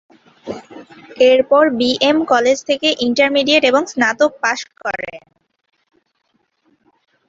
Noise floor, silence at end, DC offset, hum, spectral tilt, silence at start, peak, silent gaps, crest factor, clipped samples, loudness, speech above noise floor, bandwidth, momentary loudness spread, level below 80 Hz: -65 dBFS; 2.1 s; under 0.1%; none; -2.5 dB/octave; 0.45 s; -2 dBFS; none; 16 dB; under 0.1%; -15 LUFS; 51 dB; 7.8 kHz; 18 LU; -58 dBFS